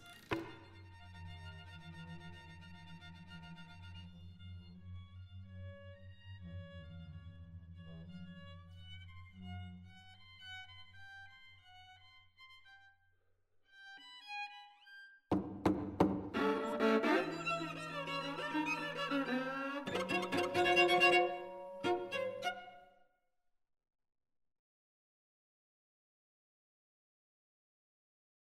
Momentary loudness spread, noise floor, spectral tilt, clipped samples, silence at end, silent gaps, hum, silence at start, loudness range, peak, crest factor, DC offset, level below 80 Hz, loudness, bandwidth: 23 LU; -81 dBFS; -5 dB/octave; under 0.1%; 5.7 s; none; none; 0 s; 20 LU; -16 dBFS; 26 dB; under 0.1%; -68 dBFS; -36 LUFS; 15.5 kHz